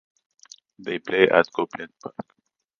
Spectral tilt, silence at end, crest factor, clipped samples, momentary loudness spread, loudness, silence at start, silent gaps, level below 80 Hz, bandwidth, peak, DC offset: -5 dB/octave; 0.7 s; 24 dB; under 0.1%; 20 LU; -22 LUFS; 0.8 s; none; -66 dBFS; 7.2 kHz; 0 dBFS; under 0.1%